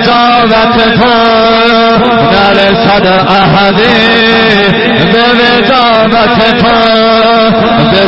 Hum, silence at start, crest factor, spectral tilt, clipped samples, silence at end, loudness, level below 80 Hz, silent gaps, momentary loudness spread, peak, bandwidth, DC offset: none; 0 s; 6 dB; -7 dB/octave; 0.5%; 0 s; -5 LUFS; -32 dBFS; none; 1 LU; 0 dBFS; 8 kHz; under 0.1%